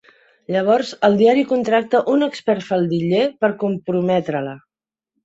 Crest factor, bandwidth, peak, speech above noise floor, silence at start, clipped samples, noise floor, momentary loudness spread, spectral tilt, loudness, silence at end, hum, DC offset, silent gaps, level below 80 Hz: 18 dB; 8 kHz; -2 dBFS; 72 dB; 0.5 s; under 0.1%; -89 dBFS; 8 LU; -7 dB/octave; -18 LUFS; 0.65 s; none; under 0.1%; none; -64 dBFS